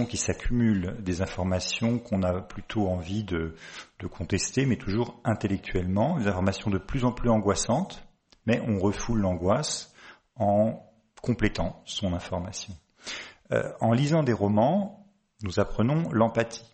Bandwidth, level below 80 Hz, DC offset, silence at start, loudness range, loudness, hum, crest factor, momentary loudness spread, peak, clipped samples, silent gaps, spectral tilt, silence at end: 8.8 kHz; -44 dBFS; under 0.1%; 0 s; 3 LU; -27 LUFS; none; 18 dB; 13 LU; -10 dBFS; under 0.1%; none; -5.5 dB/octave; 0.1 s